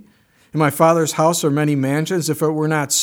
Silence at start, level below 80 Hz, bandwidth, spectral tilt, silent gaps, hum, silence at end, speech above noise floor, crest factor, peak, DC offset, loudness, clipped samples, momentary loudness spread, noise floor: 0.55 s; -66 dBFS; over 20 kHz; -4.5 dB/octave; none; none; 0 s; 38 dB; 18 dB; 0 dBFS; under 0.1%; -17 LUFS; under 0.1%; 5 LU; -54 dBFS